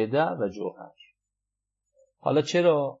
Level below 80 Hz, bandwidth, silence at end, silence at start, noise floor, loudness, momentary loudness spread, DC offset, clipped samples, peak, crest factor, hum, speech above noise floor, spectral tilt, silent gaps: -76 dBFS; 7.8 kHz; 0.05 s; 0 s; -86 dBFS; -26 LUFS; 13 LU; under 0.1%; under 0.1%; -10 dBFS; 18 dB; 50 Hz at -70 dBFS; 61 dB; -6 dB/octave; none